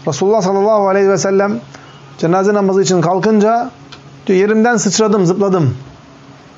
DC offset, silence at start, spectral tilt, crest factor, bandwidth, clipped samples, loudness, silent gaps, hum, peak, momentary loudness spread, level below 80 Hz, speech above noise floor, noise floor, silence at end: under 0.1%; 0.05 s; -5.5 dB/octave; 10 dB; 8 kHz; under 0.1%; -13 LUFS; none; none; -4 dBFS; 7 LU; -58 dBFS; 27 dB; -39 dBFS; 0.25 s